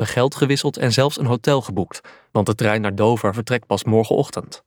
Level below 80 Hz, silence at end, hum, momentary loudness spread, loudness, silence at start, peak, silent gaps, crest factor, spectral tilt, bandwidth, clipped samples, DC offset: -56 dBFS; 0.1 s; none; 8 LU; -19 LUFS; 0 s; -4 dBFS; none; 16 dB; -5.5 dB/octave; 18.5 kHz; under 0.1%; under 0.1%